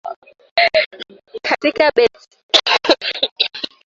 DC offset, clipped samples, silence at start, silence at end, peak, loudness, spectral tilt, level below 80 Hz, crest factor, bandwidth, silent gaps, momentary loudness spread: under 0.1%; under 0.1%; 0.05 s; 0.2 s; 0 dBFS; -16 LUFS; -1.5 dB/octave; -58 dBFS; 18 dB; 7.8 kHz; 0.16-0.22 s, 0.51-0.56 s, 0.86-0.91 s, 2.43-2.49 s, 3.31-3.36 s; 12 LU